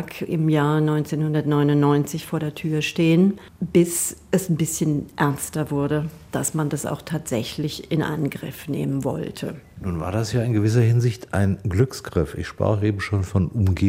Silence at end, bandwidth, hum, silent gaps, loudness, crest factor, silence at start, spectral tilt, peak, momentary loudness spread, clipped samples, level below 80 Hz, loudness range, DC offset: 0 s; 16 kHz; none; none; -23 LUFS; 16 dB; 0 s; -6 dB/octave; -4 dBFS; 9 LU; under 0.1%; -46 dBFS; 5 LU; under 0.1%